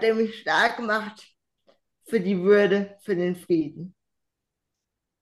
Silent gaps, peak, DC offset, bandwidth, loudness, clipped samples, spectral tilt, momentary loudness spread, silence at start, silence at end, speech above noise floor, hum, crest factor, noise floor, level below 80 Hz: none; -8 dBFS; under 0.1%; 12.5 kHz; -24 LUFS; under 0.1%; -6 dB/octave; 14 LU; 0 s; 1.3 s; 60 dB; none; 18 dB; -83 dBFS; -74 dBFS